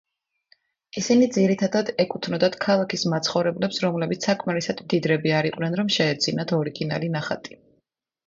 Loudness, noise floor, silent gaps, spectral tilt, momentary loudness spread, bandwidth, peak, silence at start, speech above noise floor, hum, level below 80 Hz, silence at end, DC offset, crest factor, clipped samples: -23 LUFS; -72 dBFS; none; -5 dB/octave; 7 LU; 7.8 kHz; -6 dBFS; 0.95 s; 50 dB; none; -64 dBFS; 0.8 s; under 0.1%; 18 dB; under 0.1%